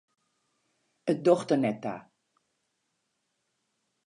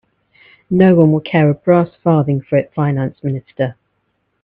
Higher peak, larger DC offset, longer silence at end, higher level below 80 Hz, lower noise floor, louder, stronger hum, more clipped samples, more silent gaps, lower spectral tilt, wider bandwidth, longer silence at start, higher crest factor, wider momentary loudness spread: second, -8 dBFS vs 0 dBFS; neither; first, 2.05 s vs 0.7 s; second, -82 dBFS vs -54 dBFS; first, -79 dBFS vs -67 dBFS; second, -27 LUFS vs -15 LUFS; neither; neither; neither; second, -7 dB/octave vs -11 dB/octave; first, 10.5 kHz vs 4.2 kHz; first, 1.05 s vs 0.7 s; first, 24 dB vs 14 dB; about the same, 13 LU vs 11 LU